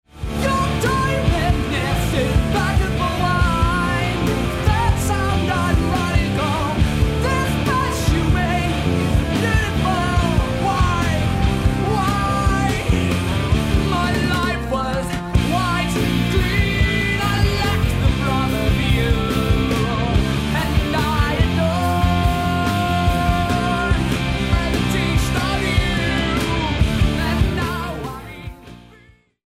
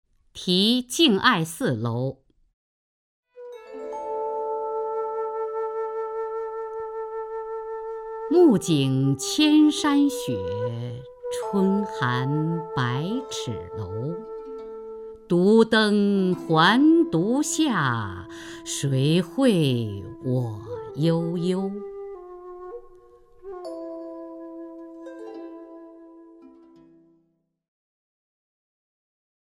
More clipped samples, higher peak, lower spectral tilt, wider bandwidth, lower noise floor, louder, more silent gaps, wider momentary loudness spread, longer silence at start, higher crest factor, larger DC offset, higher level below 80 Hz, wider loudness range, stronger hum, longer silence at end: neither; second, -4 dBFS vs 0 dBFS; about the same, -5.5 dB/octave vs -5.5 dB/octave; about the same, 16 kHz vs 16 kHz; second, -50 dBFS vs -70 dBFS; first, -19 LUFS vs -23 LUFS; second, none vs 2.53-3.23 s; second, 2 LU vs 21 LU; second, 0.15 s vs 0.35 s; second, 14 dB vs 24 dB; neither; first, -24 dBFS vs -60 dBFS; second, 1 LU vs 18 LU; neither; second, 0.6 s vs 3.1 s